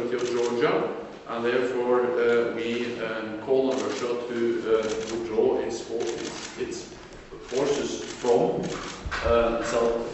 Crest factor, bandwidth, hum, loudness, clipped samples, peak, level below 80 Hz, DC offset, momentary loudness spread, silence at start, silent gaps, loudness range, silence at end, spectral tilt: 18 dB; 8.2 kHz; none; -26 LUFS; under 0.1%; -8 dBFS; -48 dBFS; under 0.1%; 11 LU; 0 s; none; 3 LU; 0 s; -4.5 dB/octave